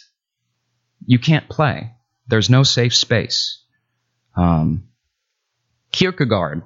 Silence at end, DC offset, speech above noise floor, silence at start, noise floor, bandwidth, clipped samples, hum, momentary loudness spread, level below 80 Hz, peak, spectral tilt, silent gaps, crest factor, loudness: 0.05 s; under 0.1%; 59 dB; 1.1 s; -75 dBFS; 7.8 kHz; under 0.1%; none; 15 LU; -42 dBFS; 0 dBFS; -5 dB/octave; none; 18 dB; -17 LUFS